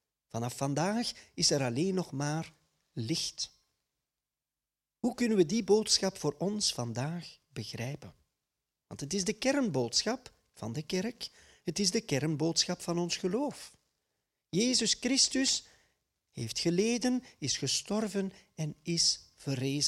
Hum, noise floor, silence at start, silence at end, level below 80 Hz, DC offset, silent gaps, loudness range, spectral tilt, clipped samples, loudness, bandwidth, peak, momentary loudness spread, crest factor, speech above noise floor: none; under -90 dBFS; 0.35 s; 0 s; -66 dBFS; under 0.1%; none; 5 LU; -3.5 dB/octave; under 0.1%; -31 LUFS; 15 kHz; -12 dBFS; 15 LU; 20 dB; over 58 dB